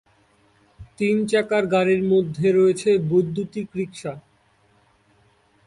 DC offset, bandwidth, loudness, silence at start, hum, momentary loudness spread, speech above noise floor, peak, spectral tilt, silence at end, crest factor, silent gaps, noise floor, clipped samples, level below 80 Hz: under 0.1%; 11.5 kHz; -21 LUFS; 0.8 s; none; 12 LU; 40 dB; -8 dBFS; -6.5 dB/octave; 1.5 s; 14 dB; none; -61 dBFS; under 0.1%; -58 dBFS